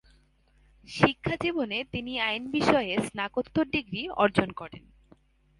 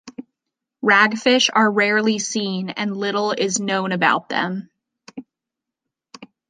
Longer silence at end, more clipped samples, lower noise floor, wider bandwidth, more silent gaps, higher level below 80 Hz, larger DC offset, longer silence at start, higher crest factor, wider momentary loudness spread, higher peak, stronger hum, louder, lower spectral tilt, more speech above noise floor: first, 0.8 s vs 0.25 s; neither; second, -63 dBFS vs -85 dBFS; first, 11.5 kHz vs 9.8 kHz; neither; first, -54 dBFS vs -72 dBFS; neither; first, 0.85 s vs 0.05 s; first, 26 dB vs 20 dB; second, 9 LU vs 15 LU; about the same, -4 dBFS vs -2 dBFS; neither; second, -28 LUFS vs -18 LUFS; first, -5.5 dB/octave vs -3 dB/octave; second, 35 dB vs 66 dB